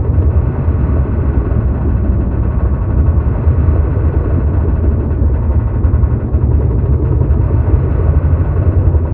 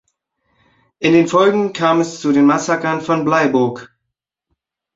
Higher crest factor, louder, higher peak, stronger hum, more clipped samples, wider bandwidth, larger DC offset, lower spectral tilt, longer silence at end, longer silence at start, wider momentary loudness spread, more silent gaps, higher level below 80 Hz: about the same, 12 dB vs 16 dB; about the same, -14 LUFS vs -15 LUFS; about the same, 0 dBFS vs -2 dBFS; neither; neither; second, 2.8 kHz vs 8 kHz; neither; first, -14.5 dB/octave vs -5.5 dB/octave; second, 0 s vs 1.1 s; second, 0 s vs 1 s; second, 2 LU vs 6 LU; neither; first, -14 dBFS vs -58 dBFS